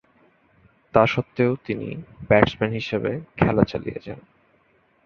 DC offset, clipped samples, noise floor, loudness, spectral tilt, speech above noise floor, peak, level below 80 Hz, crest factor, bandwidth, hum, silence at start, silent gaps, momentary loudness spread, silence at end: under 0.1%; under 0.1%; -62 dBFS; -22 LUFS; -8 dB/octave; 40 dB; -2 dBFS; -46 dBFS; 22 dB; 7 kHz; none; 0.95 s; none; 17 LU; 0.85 s